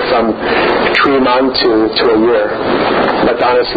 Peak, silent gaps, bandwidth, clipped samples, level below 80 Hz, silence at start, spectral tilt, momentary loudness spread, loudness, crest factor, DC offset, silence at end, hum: 0 dBFS; none; 7.4 kHz; under 0.1%; -38 dBFS; 0 s; -6.5 dB/octave; 3 LU; -11 LUFS; 10 dB; under 0.1%; 0 s; none